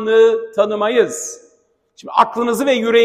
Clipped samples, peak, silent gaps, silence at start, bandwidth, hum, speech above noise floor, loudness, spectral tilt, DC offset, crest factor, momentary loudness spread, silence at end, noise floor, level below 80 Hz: under 0.1%; 0 dBFS; none; 0 s; 15.5 kHz; none; 44 dB; -16 LUFS; -3 dB/octave; under 0.1%; 16 dB; 12 LU; 0 s; -59 dBFS; -64 dBFS